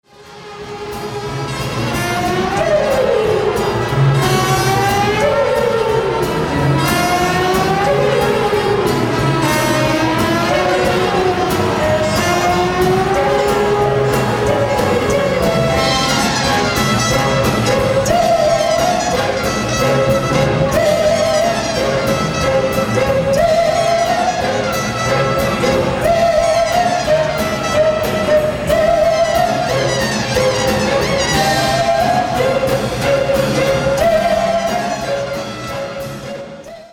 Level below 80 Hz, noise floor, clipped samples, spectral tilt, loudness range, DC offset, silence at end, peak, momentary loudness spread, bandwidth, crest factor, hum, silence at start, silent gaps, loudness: -34 dBFS; -35 dBFS; under 0.1%; -4.5 dB/octave; 1 LU; under 0.1%; 0.05 s; -2 dBFS; 4 LU; 18 kHz; 14 dB; none; 0.2 s; none; -15 LUFS